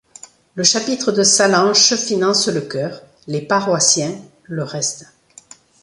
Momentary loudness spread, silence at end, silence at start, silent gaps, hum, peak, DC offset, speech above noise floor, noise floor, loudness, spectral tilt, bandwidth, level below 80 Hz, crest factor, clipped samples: 16 LU; 0.8 s; 0.55 s; none; none; 0 dBFS; under 0.1%; 28 dB; -45 dBFS; -15 LUFS; -2.5 dB/octave; 11.5 kHz; -62 dBFS; 18 dB; under 0.1%